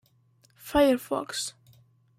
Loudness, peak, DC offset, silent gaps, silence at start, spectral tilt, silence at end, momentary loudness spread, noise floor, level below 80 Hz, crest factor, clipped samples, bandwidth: -27 LUFS; -10 dBFS; under 0.1%; none; 0.65 s; -3.5 dB/octave; 0.7 s; 13 LU; -64 dBFS; -52 dBFS; 20 dB; under 0.1%; 16.5 kHz